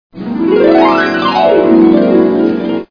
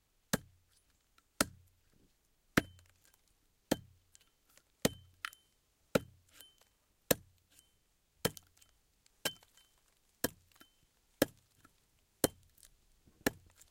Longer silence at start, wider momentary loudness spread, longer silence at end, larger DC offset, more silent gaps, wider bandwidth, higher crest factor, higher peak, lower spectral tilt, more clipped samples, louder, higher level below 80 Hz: second, 0.15 s vs 0.35 s; second, 8 LU vs 22 LU; second, 0.05 s vs 0.4 s; neither; neither; second, 5.4 kHz vs 16.5 kHz; second, 10 dB vs 34 dB; first, 0 dBFS vs -8 dBFS; first, -7.5 dB/octave vs -3.5 dB/octave; first, 0.4% vs under 0.1%; first, -9 LUFS vs -38 LUFS; first, -46 dBFS vs -64 dBFS